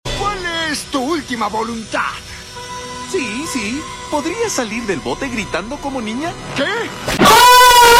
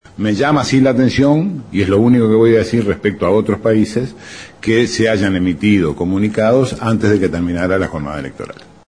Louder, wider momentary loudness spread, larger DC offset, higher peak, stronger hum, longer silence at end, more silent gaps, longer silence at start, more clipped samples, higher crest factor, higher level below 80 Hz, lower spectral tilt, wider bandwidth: about the same, -15 LUFS vs -14 LUFS; first, 18 LU vs 12 LU; second, under 0.1% vs 0.2%; about the same, -2 dBFS vs -2 dBFS; neither; second, 0 s vs 0.35 s; neither; second, 0.05 s vs 0.2 s; neither; about the same, 14 dB vs 12 dB; about the same, -38 dBFS vs -42 dBFS; second, -2.5 dB/octave vs -6.5 dB/octave; first, 17 kHz vs 10.5 kHz